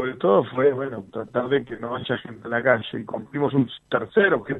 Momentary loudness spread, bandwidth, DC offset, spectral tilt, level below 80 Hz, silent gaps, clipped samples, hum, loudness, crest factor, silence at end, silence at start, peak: 11 LU; 4.1 kHz; under 0.1%; -8.5 dB/octave; -60 dBFS; none; under 0.1%; none; -23 LUFS; 18 dB; 0 s; 0 s; -6 dBFS